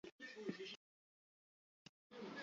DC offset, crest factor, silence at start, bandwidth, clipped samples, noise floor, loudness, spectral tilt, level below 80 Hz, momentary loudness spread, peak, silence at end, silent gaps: under 0.1%; 24 dB; 0.05 s; 7.4 kHz; under 0.1%; under -90 dBFS; -53 LUFS; -3 dB/octave; under -90 dBFS; 18 LU; -32 dBFS; 0 s; 0.12-0.19 s, 0.77-2.10 s